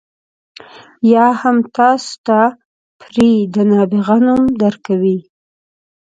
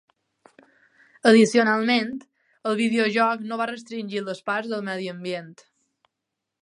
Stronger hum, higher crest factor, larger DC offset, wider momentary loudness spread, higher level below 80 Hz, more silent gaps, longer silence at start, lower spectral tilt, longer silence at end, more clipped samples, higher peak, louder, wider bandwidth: neither; second, 14 dB vs 22 dB; neither; second, 6 LU vs 16 LU; first, -52 dBFS vs -78 dBFS; first, 2.18-2.24 s, 2.65-3.00 s vs none; second, 1.05 s vs 1.25 s; first, -7 dB/octave vs -4.5 dB/octave; second, 0.85 s vs 1.1 s; neither; about the same, 0 dBFS vs -2 dBFS; first, -13 LUFS vs -23 LUFS; second, 9 kHz vs 11 kHz